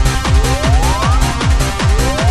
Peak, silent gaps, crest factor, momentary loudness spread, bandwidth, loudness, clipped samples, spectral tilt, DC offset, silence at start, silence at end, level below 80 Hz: -2 dBFS; none; 10 dB; 1 LU; 13.5 kHz; -14 LUFS; under 0.1%; -4.5 dB/octave; under 0.1%; 0 s; 0 s; -14 dBFS